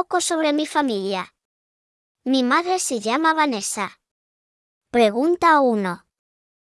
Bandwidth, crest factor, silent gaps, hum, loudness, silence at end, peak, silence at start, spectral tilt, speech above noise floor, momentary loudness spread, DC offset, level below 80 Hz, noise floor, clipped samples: 12 kHz; 18 dB; 1.45-2.15 s, 4.11-4.81 s; none; -20 LUFS; 0.65 s; -4 dBFS; 0 s; -3 dB/octave; over 70 dB; 12 LU; under 0.1%; -64 dBFS; under -90 dBFS; under 0.1%